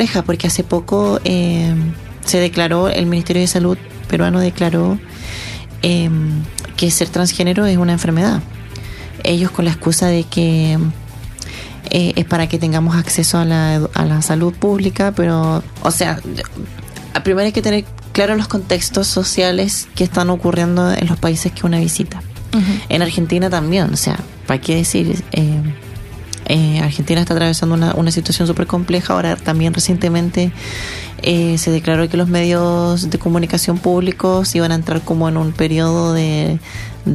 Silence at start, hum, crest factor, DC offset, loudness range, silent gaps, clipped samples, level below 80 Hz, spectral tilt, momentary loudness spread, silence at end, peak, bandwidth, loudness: 0 s; none; 16 dB; under 0.1%; 2 LU; none; under 0.1%; -36 dBFS; -5 dB/octave; 9 LU; 0 s; 0 dBFS; 13.5 kHz; -16 LUFS